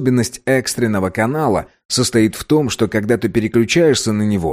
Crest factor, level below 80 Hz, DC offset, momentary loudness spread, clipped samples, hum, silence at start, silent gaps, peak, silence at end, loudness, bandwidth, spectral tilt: 12 dB; -44 dBFS; under 0.1%; 5 LU; under 0.1%; none; 0 s; 1.85-1.89 s; -2 dBFS; 0 s; -16 LUFS; 15.5 kHz; -5 dB/octave